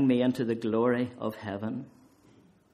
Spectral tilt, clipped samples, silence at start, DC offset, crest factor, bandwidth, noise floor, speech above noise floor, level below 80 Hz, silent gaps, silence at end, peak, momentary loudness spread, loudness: -7.5 dB/octave; under 0.1%; 0 s; under 0.1%; 16 dB; 13 kHz; -60 dBFS; 32 dB; -70 dBFS; none; 0.9 s; -14 dBFS; 11 LU; -30 LUFS